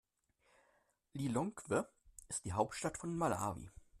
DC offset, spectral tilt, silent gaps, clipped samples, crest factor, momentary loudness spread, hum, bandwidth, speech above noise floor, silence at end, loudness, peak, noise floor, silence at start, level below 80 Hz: under 0.1%; -5.5 dB/octave; none; under 0.1%; 22 dB; 14 LU; none; 14 kHz; 38 dB; 0 s; -40 LUFS; -20 dBFS; -77 dBFS; 1.15 s; -66 dBFS